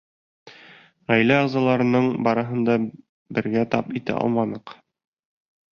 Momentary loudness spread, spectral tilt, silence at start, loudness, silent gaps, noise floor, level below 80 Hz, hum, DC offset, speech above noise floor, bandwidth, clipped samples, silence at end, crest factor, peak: 10 LU; -8 dB/octave; 0.45 s; -22 LUFS; 3.09-3.26 s; -50 dBFS; -62 dBFS; none; under 0.1%; 29 dB; 6.8 kHz; under 0.1%; 1.05 s; 20 dB; -4 dBFS